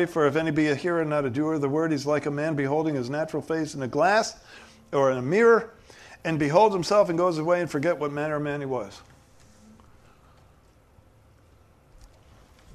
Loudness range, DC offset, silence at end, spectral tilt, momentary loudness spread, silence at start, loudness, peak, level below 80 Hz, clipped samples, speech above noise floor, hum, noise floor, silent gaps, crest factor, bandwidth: 10 LU; under 0.1%; 0.7 s; -6 dB/octave; 10 LU; 0 s; -24 LUFS; -6 dBFS; -60 dBFS; under 0.1%; 33 dB; none; -57 dBFS; none; 20 dB; 13.5 kHz